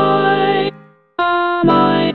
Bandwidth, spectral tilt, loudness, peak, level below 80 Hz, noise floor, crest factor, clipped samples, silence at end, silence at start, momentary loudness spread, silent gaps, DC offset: 5 kHz; -8.5 dB/octave; -15 LUFS; 0 dBFS; -56 dBFS; -38 dBFS; 14 dB; under 0.1%; 0 s; 0 s; 9 LU; none; under 0.1%